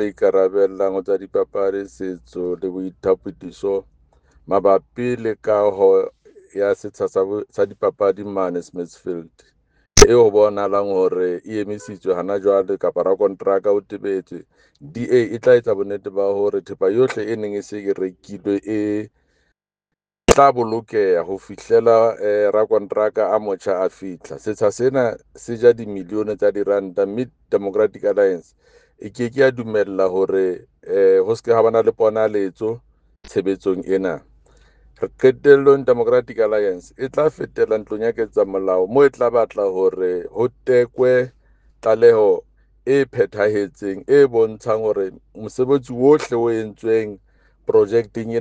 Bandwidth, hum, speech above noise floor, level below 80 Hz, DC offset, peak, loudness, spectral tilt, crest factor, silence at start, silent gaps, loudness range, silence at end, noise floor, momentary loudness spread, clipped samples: 10 kHz; none; 65 dB; -42 dBFS; under 0.1%; 0 dBFS; -18 LUFS; -5 dB/octave; 18 dB; 0 s; none; 5 LU; 0 s; -83 dBFS; 13 LU; under 0.1%